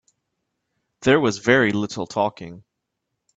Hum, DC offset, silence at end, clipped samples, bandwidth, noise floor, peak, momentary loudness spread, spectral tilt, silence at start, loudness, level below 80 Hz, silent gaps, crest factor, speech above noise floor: none; under 0.1%; 0.8 s; under 0.1%; 8.2 kHz; -79 dBFS; -2 dBFS; 13 LU; -5 dB/octave; 1 s; -20 LUFS; -60 dBFS; none; 22 dB; 59 dB